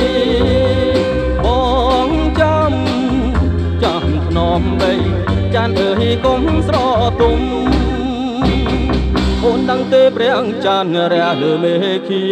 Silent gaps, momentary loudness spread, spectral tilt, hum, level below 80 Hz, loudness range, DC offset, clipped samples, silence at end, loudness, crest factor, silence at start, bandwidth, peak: none; 3 LU; -7 dB/octave; none; -22 dBFS; 1 LU; under 0.1%; under 0.1%; 0 s; -14 LUFS; 12 dB; 0 s; 9.4 kHz; 0 dBFS